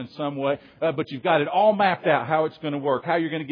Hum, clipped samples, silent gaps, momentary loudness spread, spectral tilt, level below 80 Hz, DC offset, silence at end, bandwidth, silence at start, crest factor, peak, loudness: none; under 0.1%; none; 8 LU; -8.5 dB/octave; -72 dBFS; under 0.1%; 0 s; 5.2 kHz; 0 s; 18 dB; -6 dBFS; -23 LUFS